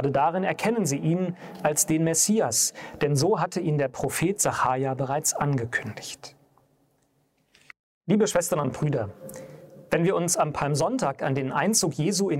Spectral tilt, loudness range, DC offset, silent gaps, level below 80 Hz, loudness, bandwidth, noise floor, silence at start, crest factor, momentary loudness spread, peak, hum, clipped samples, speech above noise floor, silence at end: -4.5 dB/octave; 6 LU; under 0.1%; 7.79-8.01 s; -60 dBFS; -25 LUFS; 16 kHz; -68 dBFS; 0 s; 18 dB; 9 LU; -8 dBFS; none; under 0.1%; 44 dB; 0 s